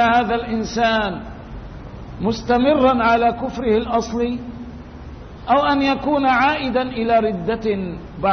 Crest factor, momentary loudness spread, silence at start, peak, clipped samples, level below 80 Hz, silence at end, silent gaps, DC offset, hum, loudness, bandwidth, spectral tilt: 16 dB; 20 LU; 0 s; -4 dBFS; under 0.1%; -38 dBFS; 0 s; none; under 0.1%; none; -19 LUFS; 6.6 kHz; -6 dB/octave